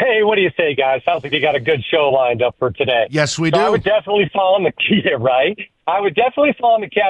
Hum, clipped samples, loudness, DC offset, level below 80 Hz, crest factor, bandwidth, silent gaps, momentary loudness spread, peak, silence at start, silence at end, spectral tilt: none; under 0.1%; -16 LUFS; under 0.1%; -52 dBFS; 14 dB; 10.5 kHz; none; 4 LU; -2 dBFS; 0 s; 0 s; -5 dB/octave